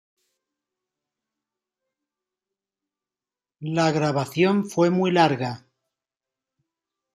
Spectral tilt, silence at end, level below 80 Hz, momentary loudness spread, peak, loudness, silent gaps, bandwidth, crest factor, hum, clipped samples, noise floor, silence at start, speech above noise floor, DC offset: -6 dB/octave; 1.55 s; -68 dBFS; 11 LU; -4 dBFS; -22 LUFS; none; 14 kHz; 22 dB; none; under 0.1%; under -90 dBFS; 3.6 s; over 69 dB; under 0.1%